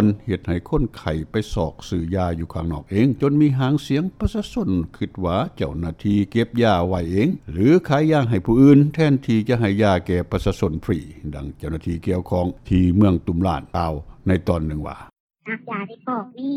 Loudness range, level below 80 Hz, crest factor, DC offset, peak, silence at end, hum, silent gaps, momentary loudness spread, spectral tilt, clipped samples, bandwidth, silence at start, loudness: 6 LU; -36 dBFS; 16 dB; under 0.1%; -2 dBFS; 0 s; none; 15.20-15.29 s; 11 LU; -8 dB/octave; under 0.1%; 13 kHz; 0 s; -21 LUFS